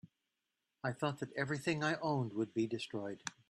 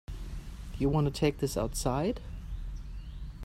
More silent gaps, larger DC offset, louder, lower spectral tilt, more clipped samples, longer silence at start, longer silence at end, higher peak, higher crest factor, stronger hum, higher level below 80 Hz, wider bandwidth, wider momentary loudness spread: neither; neither; second, -39 LUFS vs -32 LUFS; about the same, -5.5 dB/octave vs -6 dB/octave; neither; about the same, 0.05 s vs 0.1 s; first, 0.2 s vs 0 s; second, -20 dBFS vs -14 dBFS; about the same, 20 dB vs 20 dB; neither; second, -76 dBFS vs -40 dBFS; second, 12.5 kHz vs 15.5 kHz; second, 7 LU vs 16 LU